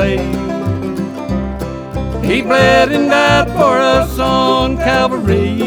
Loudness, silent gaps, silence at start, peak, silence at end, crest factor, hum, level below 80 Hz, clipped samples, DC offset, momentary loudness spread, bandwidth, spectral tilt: -13 LUFS; none; 0 s; 0 dBFS; 0 s; 14 dB; none; -28 dBFS; under 0.1%; under 0.1%; 11 LU; over 20 kHz; -5.5 dB/octave